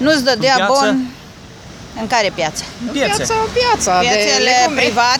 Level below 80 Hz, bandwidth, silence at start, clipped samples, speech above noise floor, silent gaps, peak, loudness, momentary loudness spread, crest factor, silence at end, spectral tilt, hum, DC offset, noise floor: -42 dBFS; 18.5 kHz; 0 s; under 0.1%; 22 dB; none; 0 dBFS; -14 LUFS; 12 LU; 14 dB; 0 s; -2.5 dB/octave; none; under 0.1%; -36 dBFS